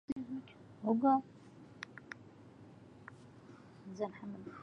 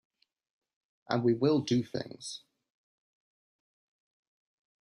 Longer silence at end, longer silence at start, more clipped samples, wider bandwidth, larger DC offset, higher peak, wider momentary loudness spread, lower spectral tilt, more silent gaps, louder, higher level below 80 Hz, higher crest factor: second, 0 s vs 2.4 s; second, 0.1 s vs 1.1 s; neither; second, 7.8 kHz vs 11 kHz; neither; second, -20 dBFS vs -12 dBFS; first, 25 LU vs 15 LU; first, -7.5 dB/octave vs -6 dB/octave; first, 0.12-0.16 s vs none; second, -37 LUFS vs -30 LUFS; about the same, -74 dBFS vs -74 dBFS; about the same, 22 dB vs 24 dB